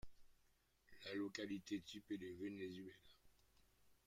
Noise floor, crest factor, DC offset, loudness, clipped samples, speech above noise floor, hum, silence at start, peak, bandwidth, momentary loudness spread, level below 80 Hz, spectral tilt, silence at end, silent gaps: -79 dBFS; 20 dB; under 0.1%; -50 LUFS; under 0.1%; 29 dB; none; 0.05 s; -34 dBFS; 16 kHz; 10 LU; -76 dBFS; -5 dB/octave; 0.1 s; none